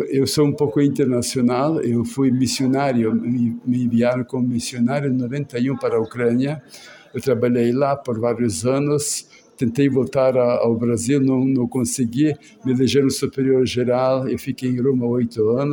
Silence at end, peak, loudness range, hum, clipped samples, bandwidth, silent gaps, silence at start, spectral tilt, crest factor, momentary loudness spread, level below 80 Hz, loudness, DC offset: 0 s; -6 dBFS; 2 LU; none; under 0.1%; 17 kHz; none; 0 s; -6 dB/octave; 14 dB; 5 LU; -56 dBFS; -20 LUFS; under 0.1%